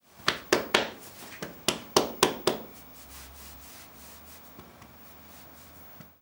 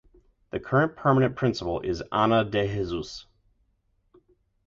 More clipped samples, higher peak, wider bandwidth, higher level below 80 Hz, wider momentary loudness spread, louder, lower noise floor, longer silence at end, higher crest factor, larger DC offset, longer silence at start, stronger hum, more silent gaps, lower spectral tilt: neither; first, -2 dBFS vs -8 dBFS; first, over 20 kHz vs 7.6 kHz; second, -60 dBFS vs -50 dBFS; first, 22 LU vs 14 LU; second, -28 LUFS vs -25 LUFS; second, -50 dBFS vs -70 dBFS; second, 0.2 s vs 1.45 s; first, 32 dB vs 20 dB; neither; second, 0.2 s vs 0.55 s; neither; neither; second, -2 dB/octave vs -7 dB/octave